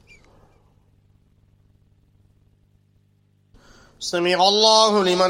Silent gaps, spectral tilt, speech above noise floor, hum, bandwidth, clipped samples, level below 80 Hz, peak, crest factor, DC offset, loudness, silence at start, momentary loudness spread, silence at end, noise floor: none; -2.5 dB/octave; 44 dB; 50 Hz at -60 dBFS; 16 kHz; under 0.1%; -62 dBFS; -2 dBFS; 22 dB; under 0.1%; -17 LUFS; 4 s; 13 LU; 0 s; -61 dBFS